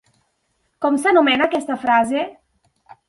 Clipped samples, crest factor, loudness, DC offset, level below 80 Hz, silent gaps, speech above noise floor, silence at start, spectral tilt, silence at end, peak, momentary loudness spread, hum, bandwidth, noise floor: under 0.1%; 18 dB; -18 LUFS; under 0.1%; -62 dBFS; none; 51 dB; 0.8 s; -3.5 dB/octave; 0.75 s; -2 dBFS; 10 LU; none; 11.5 kHz; -69 dBFS